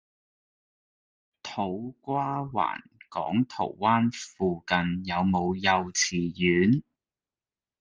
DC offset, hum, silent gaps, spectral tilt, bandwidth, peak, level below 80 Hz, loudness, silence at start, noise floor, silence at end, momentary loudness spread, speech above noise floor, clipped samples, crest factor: under 0.1%; none; none; -4.5 dB/octave; 10 kHz; -6 dBFS; -62 dBFS; -27 LUFS; 1.45 s; under -90 dBFS; 1 s; 10 LU; over 63 dB; under 0.1%; 22 dB